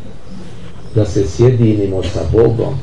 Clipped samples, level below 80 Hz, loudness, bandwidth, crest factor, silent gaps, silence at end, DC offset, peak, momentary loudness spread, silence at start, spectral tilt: under 0.1%; -34 dBFS; -14 LUFS; 9.8 kHz; 14 dB; none; 0 s; 6%; 0 dBFS; 22 LU; 0 s; -8 dB/octave